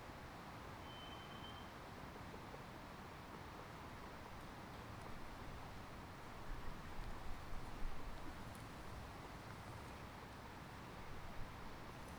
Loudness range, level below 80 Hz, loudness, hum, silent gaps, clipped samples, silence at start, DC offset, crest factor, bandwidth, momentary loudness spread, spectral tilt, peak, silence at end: 1 LU; -56 dBFS; -54 LUFS; none; none; under 0.1%; 0 s; under 0.1%; 18 dB; over 20 kHz; 2 LU; -5 dB/octave; -32 dBFS; 0 s